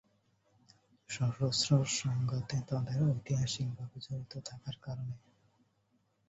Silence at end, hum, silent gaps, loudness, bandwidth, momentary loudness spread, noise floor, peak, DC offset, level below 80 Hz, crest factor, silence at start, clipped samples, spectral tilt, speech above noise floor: 1.1 s; none; none; -35 LUFS; 8.2 kHz; 15 LU; -75 dBFS; -16 dBFS; under 0.1%; -64 dBFS; 20 dB; 1.1 s; under 0.1%; -5 dB/octave; 41 dB